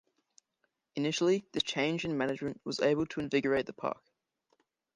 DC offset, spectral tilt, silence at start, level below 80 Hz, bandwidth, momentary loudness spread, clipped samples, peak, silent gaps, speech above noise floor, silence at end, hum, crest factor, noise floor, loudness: under 0.1%; -5 dB/octave; 0.95 s; -68 dBFS; 10.5 kHz; 8 LU; under 0.1%; -16 dBFS; none; 49 dB; 1 s; none; 18 dB; -81 dBFS; -32 LUFS